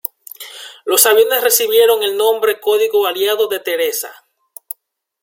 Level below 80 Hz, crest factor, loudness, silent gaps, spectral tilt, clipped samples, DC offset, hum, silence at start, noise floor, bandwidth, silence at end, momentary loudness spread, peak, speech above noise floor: -68 dBFS; 16 dB; -14 LUFS; none; 0.5 dB/octave; under 0.1%; under 0.1%; none; 0.4 s; -59 dBFS; 17 kHz; 1.1 s; 20 LU; 0 dBFS; 46 dB